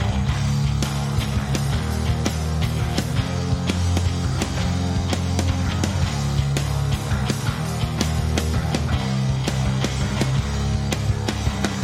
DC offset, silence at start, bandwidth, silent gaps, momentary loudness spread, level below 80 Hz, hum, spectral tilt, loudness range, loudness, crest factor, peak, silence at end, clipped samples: under 0.1%; 0 s; 15.5 kHz; none; 2 LU; -30 dBFS; none; -5.5 dB/octave; 0 LU; -23 LUFS; 18 dB; -4 dBFS; 0 s; under 0.1%